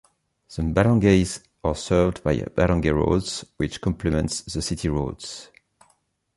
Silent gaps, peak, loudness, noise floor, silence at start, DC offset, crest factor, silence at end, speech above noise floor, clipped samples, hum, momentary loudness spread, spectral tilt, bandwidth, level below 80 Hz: none; -4 dBFS; -23 LUFS; -66 dBFS; 0.5 s; under 0.1%; 20 dB; 0.9 s; 44 dB; under 0.1%; none; 12 LU; -6 dB/octave; 11.5 kHz; -36 dBFS